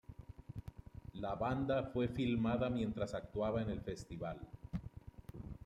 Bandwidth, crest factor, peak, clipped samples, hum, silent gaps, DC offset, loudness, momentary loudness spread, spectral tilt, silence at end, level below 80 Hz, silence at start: 11 kHz; 16 dB; -24 dBFS; under 0.1%; none; none; under 0.1%; -40 LUFS; 18 LU; -7.5 dB/octave; 0 s; -56 dBFS; 0.1 s